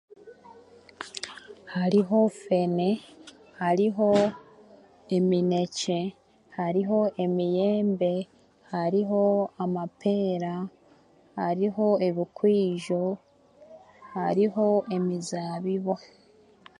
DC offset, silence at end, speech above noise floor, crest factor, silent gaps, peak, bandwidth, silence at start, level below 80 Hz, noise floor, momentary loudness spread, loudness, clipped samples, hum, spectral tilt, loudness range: under 0.1%; 0.85 s; 33 dB; 18 dB; none; -10 dBFS; 11 kHz; 0.25 s; -70 dBFS; -58 dBFS; 13 LU; -26 LUFS; under 0.1%; none; -7 dB/octave; 3 LU